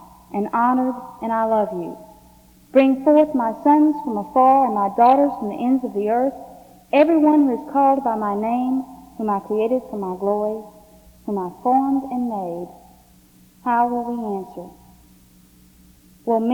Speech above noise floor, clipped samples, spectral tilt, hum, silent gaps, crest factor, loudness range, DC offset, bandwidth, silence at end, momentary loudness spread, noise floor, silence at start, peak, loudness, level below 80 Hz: 33 dB; under 0.1%; -7.5 dB/octave; none; none; 18 dB; 9 LU; under 0.1%; 20 kHz; 0 s; 15 LU; -51 dBFS; 0 s; -2 dBFS; -19 LUFS; -58 dBFS